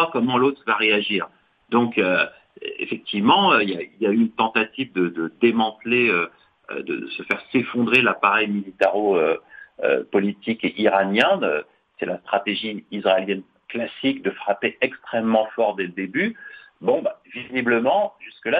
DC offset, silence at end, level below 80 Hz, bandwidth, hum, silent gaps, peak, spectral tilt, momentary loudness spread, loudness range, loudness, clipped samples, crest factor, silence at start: under 0.1%; 0 s; -66 dBFS; 8.6 kHz; none; none; -2 dBFS; -6.5 dB/octave; 11 LU; 4 LU; -21 LUFS; under 0.1%; 18 dB; 0 s